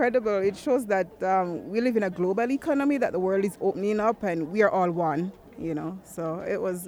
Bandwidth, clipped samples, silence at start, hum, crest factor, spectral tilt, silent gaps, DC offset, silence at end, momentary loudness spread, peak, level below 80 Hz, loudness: over 20 kHz; under 0.1%; 0 s; none; 16 dB; -7 dB/octave; none; under 0.1%; 0 s; 9 LU; -10 dBFS; -62 dBFS; -26 LUFS